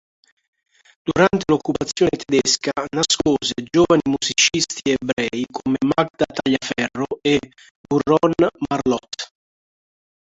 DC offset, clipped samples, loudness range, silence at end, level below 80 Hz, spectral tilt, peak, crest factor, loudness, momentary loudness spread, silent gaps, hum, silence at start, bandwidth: under 0.1%; under 0.1%; 3 LU; 1.05 s; -50 dBFS; -3.5 dB/octave; -2 dBFS; 18 dB; -19 LUFS; 8 LU; 5.13-5.17 s, 6.10-6.14 s, 7.71-7.84 s; none; 1.05 s; 8.2 kHz